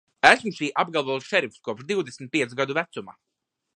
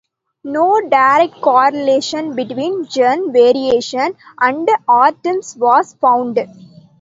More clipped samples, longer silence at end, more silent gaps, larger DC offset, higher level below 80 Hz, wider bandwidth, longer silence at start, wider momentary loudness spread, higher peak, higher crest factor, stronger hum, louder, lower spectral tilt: neither; about the same, 0.65 s vs 0.55 s; neither; neither; second, -66 dBFS vs -60 dBFS; first, 11.5 kHz vs 7.8 kHz; second, 0.25 s vs 0.45 s; first, 15 LU vs 9 LU; about the same, 0 dBFS vs 0 dBFS; first, 26 dB vs 14 dB; neither; second, -24 LUFS vs -14 LUFS; about the same, -3.5 dB/octave vs -4 dB/octave